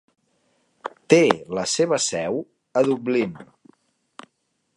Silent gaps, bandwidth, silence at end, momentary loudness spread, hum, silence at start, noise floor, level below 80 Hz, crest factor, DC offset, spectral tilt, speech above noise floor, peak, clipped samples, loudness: none; 11.5 kHz; 1.35 s; 20 LU; none; 0.85 s; -72 dBFS; -66 dBFS; 24 dB; under 0.1%; -4 dB/octave; 51 dB; 0 dBFS; under 0.1%; -21 LUFS